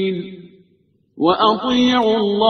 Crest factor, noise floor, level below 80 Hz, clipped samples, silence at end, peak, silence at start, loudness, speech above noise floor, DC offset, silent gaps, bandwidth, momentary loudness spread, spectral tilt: 18 dB; -60 dBFS; -54 dBFS; under 0.1%; 0 s; 0 dBFS; 0 s; -17 LUFS; 43 dB; under 0.1%; none; 6.6 kHz; 11 LU; -5.5 dB/octave